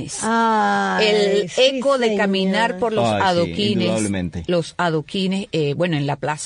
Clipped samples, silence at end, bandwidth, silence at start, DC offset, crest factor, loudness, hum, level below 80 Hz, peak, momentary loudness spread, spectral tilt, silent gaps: under 0.1%; 0 s; 11 kHz; 0 s; under 0.1%; 16 dB; -19 LUFS; none; -52 dBFS; -4 dBFS; 6 LU; -4.5 dB/octave; none